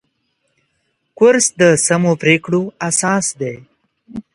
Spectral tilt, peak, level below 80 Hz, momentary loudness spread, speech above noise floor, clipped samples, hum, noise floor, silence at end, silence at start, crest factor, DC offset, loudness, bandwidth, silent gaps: -4 dB/octave; 0 dBFS; -58 dBFS; 16 LU; 53 dB; under 0.1%; none; -67 dBFS; 0.15 s; 1.2 s; 16 dB; under 0.1%; -14 LUFS; 11.5 kHz; none